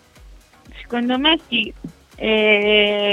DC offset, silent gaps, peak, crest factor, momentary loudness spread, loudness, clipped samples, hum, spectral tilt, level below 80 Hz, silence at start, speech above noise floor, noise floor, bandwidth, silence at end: under 0.1%; none; -2 dBFS; 18 dB; 12 LU; -17 LUFS; under 0.1%; none; -5 dB/octave; -46 dBFS; 0.25 s; 28 dB; -45 dBFS; 9.8 kHz; 0 s